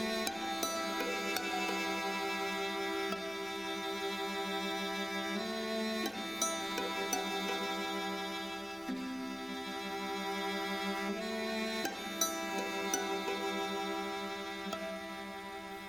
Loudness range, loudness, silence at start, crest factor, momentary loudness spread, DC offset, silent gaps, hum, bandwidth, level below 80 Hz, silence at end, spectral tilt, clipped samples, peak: 3 LU; -36 LUFS; 0 s; 22 dB; 6 LU; under 0.1%; none; none; 19 kHz; -68 dBFS; 0 s; -2.5 dB/octave; under 0.1%; -16 dBFS